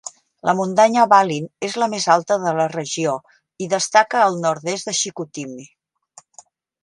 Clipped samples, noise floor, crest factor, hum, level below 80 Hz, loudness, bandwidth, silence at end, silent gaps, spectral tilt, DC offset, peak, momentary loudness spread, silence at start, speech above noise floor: under 0.1%; -50 dBFS; 20 dB; none; -70 dBFS; -18 LUFS; 11.5 kHz; 1.2 s; none; -3.5 dB/octave; under 0.1%; 0 dBFS; 16 LU; 0.05 s; 32 dB